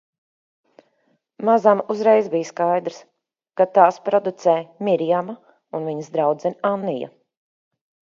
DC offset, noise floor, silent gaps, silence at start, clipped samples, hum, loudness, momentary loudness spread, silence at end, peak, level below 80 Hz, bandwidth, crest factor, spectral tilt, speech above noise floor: under 0.1%; -67 dBFS; none; 1.4 s; under 0.1%; none; -20 LUFS; 15 LU; 1.05 s; 0 dBFS; -76 dBFS; 7.4 kHz; 20 dB; -6.5 dB/octave; 47 dB